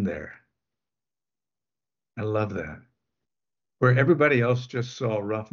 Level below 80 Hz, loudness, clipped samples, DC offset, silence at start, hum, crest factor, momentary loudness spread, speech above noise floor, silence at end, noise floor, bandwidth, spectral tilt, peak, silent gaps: -60 dBFS; -24 LUFS; under 0.1%; under 0.1%; 0 s; none; 20 dB; 18 LU; over 66 dB; 0.1 s; under -90 dBFS; 7 kHz; -7.5 dB/octave; -8 dBFS; none